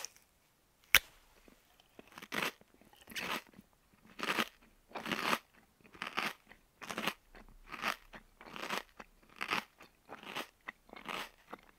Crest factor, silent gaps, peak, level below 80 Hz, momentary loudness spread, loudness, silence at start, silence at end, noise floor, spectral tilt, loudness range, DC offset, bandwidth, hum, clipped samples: 38 dB; none; -4 dBFS; -66 dBFS; 20 LU; -38 LUFS; 0 s; 0.2 s; -72 dBFS; -1.5 dB/octave; 6 LU; under 0.1%; 16 kHz; none; under 0.1%